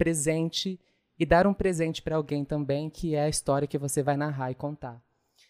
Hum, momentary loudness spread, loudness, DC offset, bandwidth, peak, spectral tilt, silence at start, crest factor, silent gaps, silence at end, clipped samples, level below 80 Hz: none; 12 LU; -28 LUFS; under 0.1%; 15.5 kHz; -6 dBFS; -5 dB/octave; 0 s; 22 dB; none; 0.5 s; under 0.1%; -48 dBFS